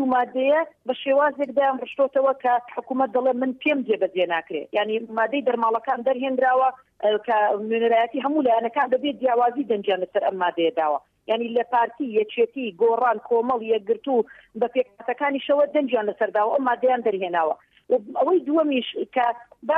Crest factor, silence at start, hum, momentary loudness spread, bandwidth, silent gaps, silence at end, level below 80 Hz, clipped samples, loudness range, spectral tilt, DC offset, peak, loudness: 12 dB; 0 s; none; 5 LU; 4.3 kHz; none; 0 s; -72 dBFS; under 0.1%; 2 LU; -7 dB/octave; under 0.1%; -10 dBFS; -23 LUFS